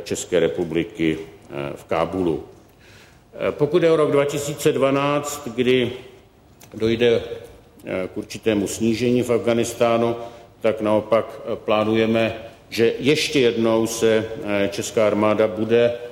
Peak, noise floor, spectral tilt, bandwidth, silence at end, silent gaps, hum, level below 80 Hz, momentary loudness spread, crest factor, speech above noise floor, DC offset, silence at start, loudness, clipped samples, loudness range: -6 dBFS; -49 dBFS; -5 dB/octave; 16 kHz; 0 s; none; none; -52 dBFS; 12 LU; 16 dB; 29 dB; under 0.1%; 0 s; -21 LUFS; under 0.1%; 4 LU